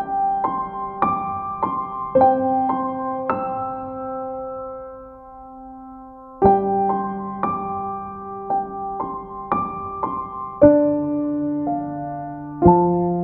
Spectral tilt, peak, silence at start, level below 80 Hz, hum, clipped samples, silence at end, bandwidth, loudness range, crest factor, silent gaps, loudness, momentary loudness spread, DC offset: -12.5 dB/octave; 0 dBFS; 0 s; -46 dBFS; none; under 0.1%; 0 s; 4.2 kHz; 6 LU; 22 dB; none; -21 LUFS; 20 LU; under 0.1%